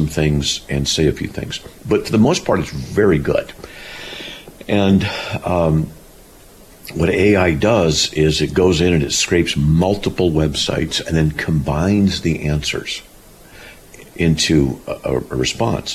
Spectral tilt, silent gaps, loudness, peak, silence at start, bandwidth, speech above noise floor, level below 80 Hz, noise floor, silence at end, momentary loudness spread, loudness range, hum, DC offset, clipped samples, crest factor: -5 dB/octave; none; -17 LUFS; -4 dBFS; 0 s; 14.5 kHz; 26 dB; -34 dBFS; -43 dBFS; 0 s; 14 LU; 5 LU; none; under 0.1%; under 0.1%; 14 dB